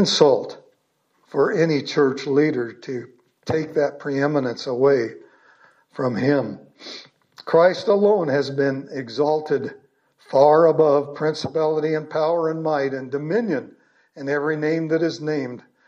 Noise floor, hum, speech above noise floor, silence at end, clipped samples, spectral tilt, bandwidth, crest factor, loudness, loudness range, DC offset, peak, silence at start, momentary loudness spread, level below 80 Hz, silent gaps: -67 dBFS; none; 47 dB; 0.25 s; under 0.1%; -6 dB/octave; 8.4 kHz; 20 dB; -21 LUFS; 4 LU; under 0.1%; -2 dBFS; 0 s; 15 LU; -70 dBFS; none